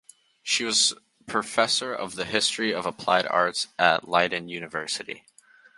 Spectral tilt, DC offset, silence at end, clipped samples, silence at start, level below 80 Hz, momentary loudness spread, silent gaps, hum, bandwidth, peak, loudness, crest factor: -1.5 dB/octave; under 0.1%; 0.6 s; under 0.1%; 0.45 s; -66 dBFS; 11 LU; none; none; 11.5 kHz; -2 dBFS; -24 LUFS; 24 dB